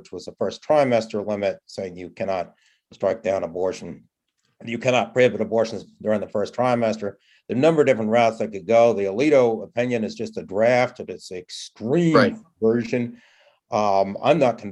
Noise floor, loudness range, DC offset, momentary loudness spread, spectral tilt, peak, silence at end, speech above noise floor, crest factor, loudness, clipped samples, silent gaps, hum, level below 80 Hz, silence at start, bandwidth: -72 dBFS; 6 LU; under 0.1%; 15 LU; -6 dB/octave; -2 dBFS; 0 s; 51 dB; 20 dB; -22 LUFS; under 0.1%; none; none; -68 dBFS; 0.15 s; 11 kHz